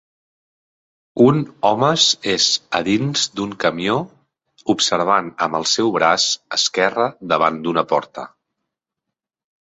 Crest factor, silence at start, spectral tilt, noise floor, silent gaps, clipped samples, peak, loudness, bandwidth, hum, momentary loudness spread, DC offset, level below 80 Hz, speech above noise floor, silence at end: 18 dB; 1.15 s; -3.5 dB/octave; -83 dBFS; none; under 0.1%; -2 dBFS; -17 LUFS; 8.2 kHz; none; 8 LU; under 0.1%; -60 dBFS; 65 dB; 1.35 s